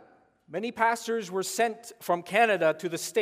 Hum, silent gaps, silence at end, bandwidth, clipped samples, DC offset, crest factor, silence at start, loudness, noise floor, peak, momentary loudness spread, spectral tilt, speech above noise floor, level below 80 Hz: none; none; 0 s; 16 kHz; under 0.1%; under 0.1%; 18 dB; 0.5 s; -27 LUFS; -59 dBFS; -10 dBFS; 11 LU; -3 dB/octave; 32 dB; -78 dBFS